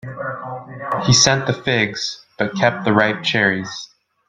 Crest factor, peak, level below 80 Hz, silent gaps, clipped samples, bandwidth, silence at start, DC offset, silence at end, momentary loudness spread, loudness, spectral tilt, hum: 20 dB; 0 dBFS; -50 dBFS; none; under 0.1%; 10.5 kHz; 0.05 s; under 0.1%; 0.45 s; 17 LU; -17 LUFS; -3.5 dB/octave; none